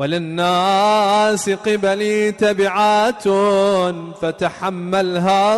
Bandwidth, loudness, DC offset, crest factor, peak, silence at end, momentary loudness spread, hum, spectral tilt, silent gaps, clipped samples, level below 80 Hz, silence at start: 12 kHz; -17 LUFS; under 0.1%; 10 dB; -8 dBFS; 0 s; 7 LU; none; -4.5 dB/octave; none; under 0.1%; -56 dBFS; 0 s